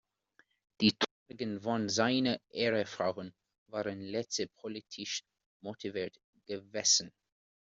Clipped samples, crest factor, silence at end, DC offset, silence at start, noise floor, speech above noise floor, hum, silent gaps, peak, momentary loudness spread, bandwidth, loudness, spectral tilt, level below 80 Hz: under 0.1%; 24 dB; 0.55 s; under 0.1%; 0.8 s; -71 dBFS; 36 dB; none; 1.11-1.26 s, 3.58-3.66 s, 5.46-5.60 s, 6.24-6.33 s; -12 dBFS; 15 LU; 8 kHz; -33 LUFS; -3 dB/octave; -72 dBFS